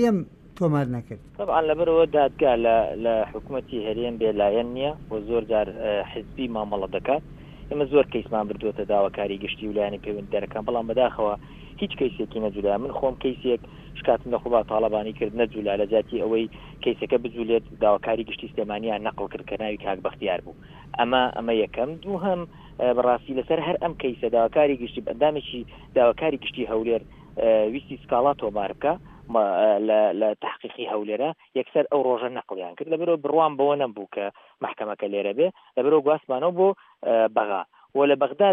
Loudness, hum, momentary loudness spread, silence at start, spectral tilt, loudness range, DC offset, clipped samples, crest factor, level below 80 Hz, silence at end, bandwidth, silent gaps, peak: -25 LUFS; none; 11 LU; 0 s; -7.5 dB/octave; 4 LU; under 0.1%; under 0.1%; 18 dB; -50 dBFS; 0 s; 6.8 kHz; none; -6 dBFS